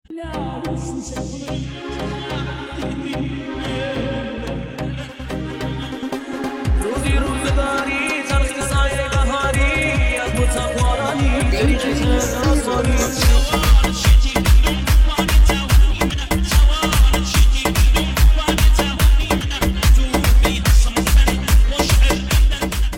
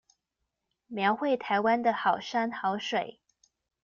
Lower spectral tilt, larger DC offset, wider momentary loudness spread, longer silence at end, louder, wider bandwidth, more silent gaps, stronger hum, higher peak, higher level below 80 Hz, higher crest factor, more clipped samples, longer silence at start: about the same, -4.5 dB/octave vs -5 dB/octave; neither; first, 11 LU vs 7 LU; second, 0 s vs 0.7 s; first, -18 LUFS vs -28 LUFS; first, 16.5 kHz vs 7.2 kHz; neither; neither; first, -2 dBFS vs -12 dBFS; first, -18 dBFS vs -76 dBFS; about the same, 14 dB vs 18 dB; neither; second, 0.1 s vs 0.9 s